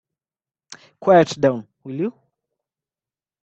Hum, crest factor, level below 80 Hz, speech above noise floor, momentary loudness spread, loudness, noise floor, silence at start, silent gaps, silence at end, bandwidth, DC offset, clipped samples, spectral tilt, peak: none; 22 dB; -62 dBFS; over 73 dB; 15 LU; -19 LUFS; under -90 dBFS; 1 s; none; 1.35 s; 8.4 kHz; under 0.1%; under 0.1%; -6 dB/octave; -2 dBFS